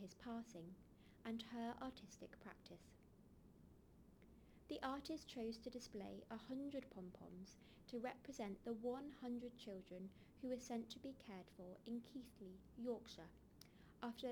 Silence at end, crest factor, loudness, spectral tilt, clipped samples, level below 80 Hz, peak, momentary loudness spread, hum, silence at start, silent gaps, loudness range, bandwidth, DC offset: 0 s; 20 dB; -53 LUFS; -5 dB/octave; under 0.1%; -74 dBFS; -32 dBFS; 19 LU; none; 0 s; none; 4 LU; over 20 kHz; under 0.1%